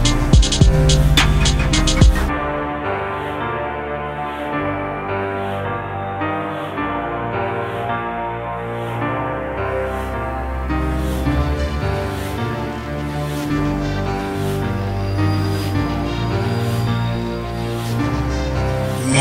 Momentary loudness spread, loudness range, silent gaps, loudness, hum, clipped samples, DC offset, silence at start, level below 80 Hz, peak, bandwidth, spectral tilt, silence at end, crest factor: 10 LU; 6 LU; none; -20 LUFS; none; under 0.1%; under 0.1%; 0 s; -24 dBFS; 0 dBFS; 16 kHz; -5.5 dB/octave; 0 s; 18 dB